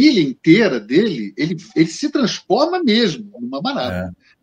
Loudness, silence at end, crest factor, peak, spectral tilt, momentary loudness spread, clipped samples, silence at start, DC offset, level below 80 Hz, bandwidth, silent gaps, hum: -17 LUFS; 0.3 s; 16 dB; 0 dBFS; -5.5 dB/octave; 10 LU; under 0.1%; 0 s; under 0.1%; -56 dBFS; 9 kHz; none; none